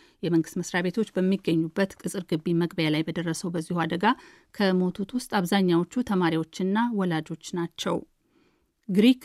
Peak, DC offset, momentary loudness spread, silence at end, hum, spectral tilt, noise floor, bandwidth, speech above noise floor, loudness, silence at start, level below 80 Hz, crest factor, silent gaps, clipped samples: -10 dBFS; under 0.1%; 8 LU; 0 s; none; -6 dB/octave; -67 dBFS; 14.5 kHz; 41 dB; -26 LUFS; 0.25 s; -64 dBFS; 16 dB; none; under 0.1%